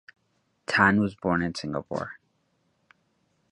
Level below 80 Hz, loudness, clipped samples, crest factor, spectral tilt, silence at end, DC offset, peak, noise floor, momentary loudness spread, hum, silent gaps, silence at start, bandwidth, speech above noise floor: -56 dBFS; -25 LUFS; under 0.1%; 24 dB; -6 dB/octave; 1.4 s; under 0.1%; -4 dBFS; -72 dBFS; 15 LU; none; none; 0.7 s; 11 kHz; 47 dB